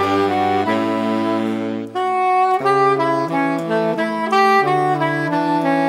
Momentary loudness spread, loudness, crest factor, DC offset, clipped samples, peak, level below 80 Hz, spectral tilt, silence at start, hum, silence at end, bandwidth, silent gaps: 6 LU; -17 LUFS; 14 dB; under 0.1%; under 0.1%; -2 dBFS; -68 dBFS; -6 dB/octave; 0 s; none; 0 s; 15.5 kHz; none